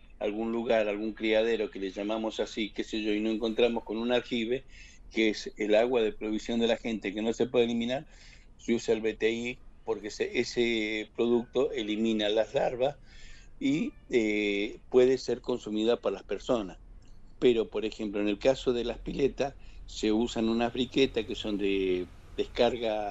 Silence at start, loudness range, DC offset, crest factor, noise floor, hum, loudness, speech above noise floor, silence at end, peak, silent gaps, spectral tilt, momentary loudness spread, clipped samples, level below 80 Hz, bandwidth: 0.15 s; 2 LU; under 0.1%; 18 dB; -48 dBFS; none; -30 LUFS; 19 dB; 0 s; -12 dBFS; none; -5 dB/octave; 8 LU; under 0.1%; -52 dBFS; 8.2 kHz